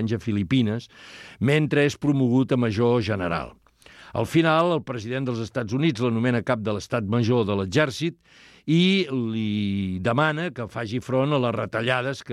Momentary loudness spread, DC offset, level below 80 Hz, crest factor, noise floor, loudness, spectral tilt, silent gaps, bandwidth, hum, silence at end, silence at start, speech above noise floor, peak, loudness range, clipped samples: 10 LU; under 0.1%; -56 dBFS; 16 dB; -50 dBFS; -24 LUFS; -6.5 dB/octave; none; 13 kHz; none; 0 s; 0 s; 26 dB; -6 dBFS; 2 LU; under 0.1%